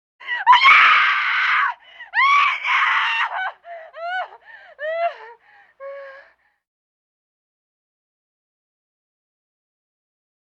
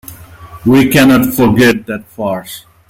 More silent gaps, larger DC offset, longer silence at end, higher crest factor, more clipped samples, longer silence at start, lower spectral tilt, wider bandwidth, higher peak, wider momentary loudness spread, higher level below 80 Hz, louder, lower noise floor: neither; neither; first, 4.35 s vs 0.3 s; first, 20 dB vs 12 dB; neither; about the same, 0.2 s vs 0.1 s; second, 1 dB/octave vs -5.5 dB/octave; second, 8.2 kHz vs 17 kHz; about the same, -2 dBFS vs 0 dBFS; first, 25 LU vs 14 LU; second, -82 dBFS vs -40 dBFS; second, -16 LUFS vs -10 LUFS; first, -52 dBFS vs -33 dBFS